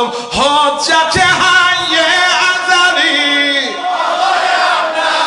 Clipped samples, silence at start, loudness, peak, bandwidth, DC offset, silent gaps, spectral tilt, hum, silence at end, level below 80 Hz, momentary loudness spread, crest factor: under 0.1%; 0 s; -10 LUFS; 0 dBFS; 11 kHz; under 0.1%; none; -1.5 dB/octave; none; 0 s; -46 dBFS; 5 LU; 12 dB